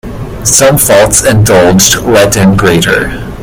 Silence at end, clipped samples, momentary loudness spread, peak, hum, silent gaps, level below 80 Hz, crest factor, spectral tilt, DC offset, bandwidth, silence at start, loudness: 0 s; 3%; 7 LU; 0 dBFS; none; none; -26 dBFS; 6 dB; -3.5 dB/octave; under 0.1%; over 20 kHz; 0.05 s; -6 LUFS